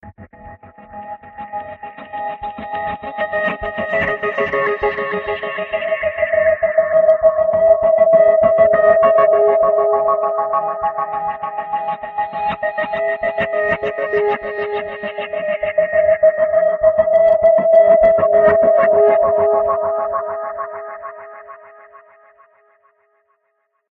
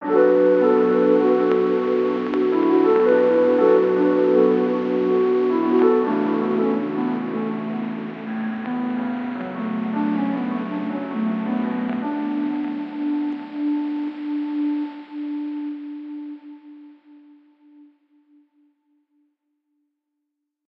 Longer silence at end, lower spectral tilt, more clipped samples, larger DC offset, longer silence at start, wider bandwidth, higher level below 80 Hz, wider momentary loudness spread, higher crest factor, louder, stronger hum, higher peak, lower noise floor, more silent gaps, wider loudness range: second, 2.35 s vs 3.8 s; second, -7.5 dB/octave vs -9 dB/octave; neither; neither; about the same, 0.05 s vs 0 s; second, 4.1 kHz vs 5.8 kHz; first, -48 dBFS vs -76 dBFS; first, 15 LU vs 12 LU; about the same, 14 dB vs 18 dB; first, -15 LUFS vs -21 LUFS; neither; about the same, -2 dBFS vs -4 dBFS; second, -68 dBFS vs -79 dBFS; neither; about the same, 11 LU vs 12 LU